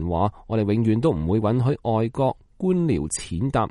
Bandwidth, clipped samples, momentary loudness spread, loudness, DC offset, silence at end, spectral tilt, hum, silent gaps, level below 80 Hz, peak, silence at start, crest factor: 11.5 kHz; under 0.1%; 4 LU; -23 LUFS; under 0.1%; 0 s; -7 dB/octave; none; none; -42 dBFS; -8 dBFS; 0 s; 14 dB